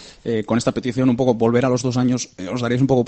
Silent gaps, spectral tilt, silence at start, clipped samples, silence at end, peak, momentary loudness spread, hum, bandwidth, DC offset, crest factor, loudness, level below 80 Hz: none; -6.5 dB/octave; 0 s; under 0.1%; 0 s; -2 dBFS; 8 LU; none; 8.8 kHz; under 0.1%; 16 dB; -20 LUFS; -50 dBFS